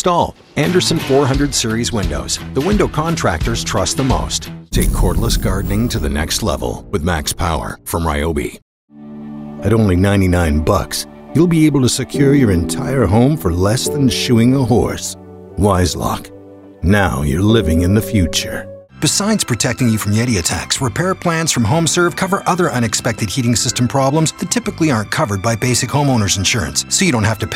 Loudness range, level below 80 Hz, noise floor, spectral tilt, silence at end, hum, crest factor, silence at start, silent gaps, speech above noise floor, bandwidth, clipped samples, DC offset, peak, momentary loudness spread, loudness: 4 LU; -28 dBFS; -37 dBFS; -4.5 dB/octave; 0 s; none; 14 dB; 0 s; 8.62-8.88 s; 23 dB; 16 kHz; under 0.1%; under 0.1%; -2 dBFS; 8 LU; -15 LUFS